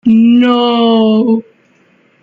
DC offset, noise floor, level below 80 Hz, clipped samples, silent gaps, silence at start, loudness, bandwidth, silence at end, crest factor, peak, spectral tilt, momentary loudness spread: under 0.1%; -51 dBFS; -56 dBFS; under 0.1%; none; 0.05 s; -10 LUFS; 4.9 kHz; 0.8 s; 8 dB; -2 dBFS; -8 dB/octave; 6 LU